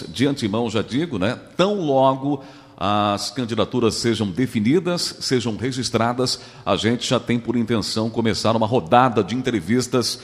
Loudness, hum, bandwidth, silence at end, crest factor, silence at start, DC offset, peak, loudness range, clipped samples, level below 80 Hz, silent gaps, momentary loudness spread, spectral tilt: -21 LUFS; none; 15 kHz; 0 s; 18 dB; 0 s; under 0.1%; -2 dBFS; 2 LU; under 0.1%; -54 dBFS; none; 6 LU; -5 dB/octave